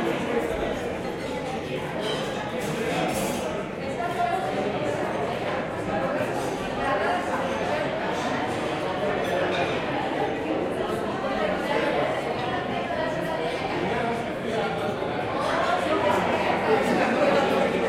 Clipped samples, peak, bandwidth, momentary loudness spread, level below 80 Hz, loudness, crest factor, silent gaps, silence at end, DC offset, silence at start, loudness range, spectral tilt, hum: under 0.1%; -10 dBFS; 16.5 kHz; 6 LU; -52 dBFS; -26 LUFS; 16 dB; none; 0 s; under 0.1%; 0 s; 3 LU; -5 dB/octave; none